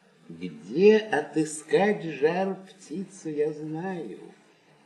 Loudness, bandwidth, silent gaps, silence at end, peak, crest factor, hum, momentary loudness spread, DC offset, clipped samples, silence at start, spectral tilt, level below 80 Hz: -26 LUFS; 11 kHz; none; 0.55 s; -8 dBFS; 20 dB; none; 20 LU; under 0.1%; under 0.1%; 0.3 s; -5.5 dB/octave; -78 dBFS